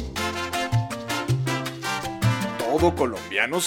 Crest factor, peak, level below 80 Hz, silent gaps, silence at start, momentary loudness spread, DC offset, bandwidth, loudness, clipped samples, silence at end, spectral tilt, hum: 18 dB; -6 dBFS; -44 dBFS; none; 0 s; 6 LU; under 0.1%; 18 kHz; -25 LUFS; under 0.1%; 0 s; -5 dB/octave; none